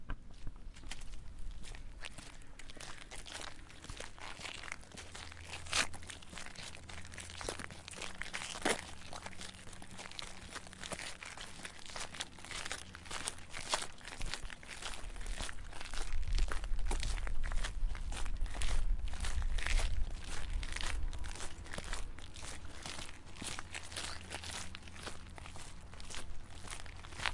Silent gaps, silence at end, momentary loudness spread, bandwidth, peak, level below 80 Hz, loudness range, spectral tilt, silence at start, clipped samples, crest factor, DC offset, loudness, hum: none; 0 s; 12 LU; 11.5 kHz; -12 dBFS; -42 dBFS; 7 LU; -2.5 dB/octave; 0 s; under 0.1%; 26 dB; under 0.1%; -44 LUFS; none